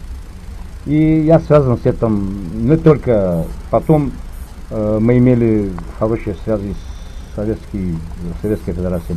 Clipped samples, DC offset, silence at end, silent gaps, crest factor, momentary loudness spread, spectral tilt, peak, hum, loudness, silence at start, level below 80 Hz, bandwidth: under 0.1%; 0.4%; 0 s; none; 16 dB; 21 LU; -9.5 dB/octave; 0 dBFS; none; -16 LUFS; 0 s; -28 dBFS; 13.5 kHz